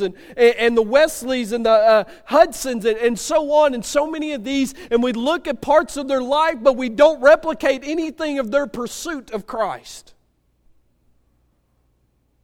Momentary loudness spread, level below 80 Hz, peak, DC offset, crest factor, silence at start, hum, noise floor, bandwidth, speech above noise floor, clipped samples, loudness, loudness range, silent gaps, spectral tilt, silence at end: 11 LU; -48 dBFS; 0 dBFS; under 0.1%; 18 dB; 0 s; none; -63 dBFS; 17 kHz; 45 dB; under 0.1%; -18 LUFS; 11 LU; none; -3.5 dB/octave; 2.45 s